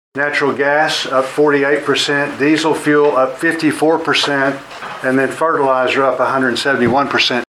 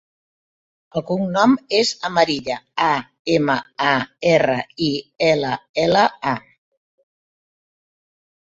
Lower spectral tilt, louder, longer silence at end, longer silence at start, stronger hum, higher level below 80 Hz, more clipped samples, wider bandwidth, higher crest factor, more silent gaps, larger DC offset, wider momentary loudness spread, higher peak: about the same, -4 dB/octave vs -5 dB/octave; first, -14 LUFS vs -19 LUFS; second, 0.15 s vs 2.1 s; second, 0.15 s vs 0.95 s; neither; about the same, -56 dBFS vs -56 dBFS; neither; first, 14 kHz vs 8 kHz; second, 12 dB vs 20 dB; second, none vs 3.19-3.25 s, 5.69-5.74 s; neither; second, 4 LU vs 8 LU; about the same, -2 dBFS vs -2 dBFS